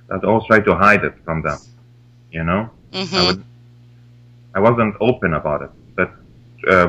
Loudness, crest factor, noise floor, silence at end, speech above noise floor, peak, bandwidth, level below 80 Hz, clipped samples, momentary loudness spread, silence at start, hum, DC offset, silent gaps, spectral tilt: -17 LUFS; 18 dB; -47 dBFS; 0 s; 31 dB; 0 dBFS; 10.5 kHz; -40 dBFS; under 0.1%; 14 LU; 0.1 s; 60 Hz at -45 dBFS; under 0.1%; none; -6 dB/octave